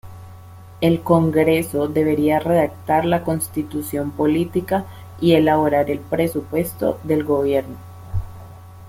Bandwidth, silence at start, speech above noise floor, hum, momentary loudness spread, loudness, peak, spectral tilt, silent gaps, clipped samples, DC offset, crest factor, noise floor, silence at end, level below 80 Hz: 16.5 kHz; 0.05 s; 21 dB; none; 14 LU; -19 LUFS; -2 dBFS; -6.5 dB/octave; none; under 0.1%; under 0.1%; 18 dB; -40 dBFS; 0 s; -44 dBFS